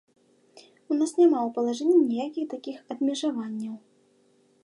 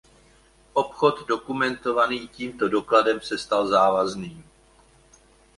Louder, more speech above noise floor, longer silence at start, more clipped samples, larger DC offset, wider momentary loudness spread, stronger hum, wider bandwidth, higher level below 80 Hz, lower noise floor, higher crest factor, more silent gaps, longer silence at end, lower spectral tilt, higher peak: about the same, -25 LUFS vs -23 LUFS; first, 39 dB vs 33 dB; second, 0.55 s vs 0.75 s; neither; neither; first, 16 LU vs 9 LU; neither; about the same, 11 kHz vs 11.5 kHz; second, -84 dBFS vs -58 dBFS; first, -63 dBFS vs -56 dBFS; about the same, 16 dB vs 20 dB; neither; second, 0.85 s vs 1.15 s; about the same, -5 dB/octave vs -4.5 dB/octave; second, -10 dBFS vs -4 dBFS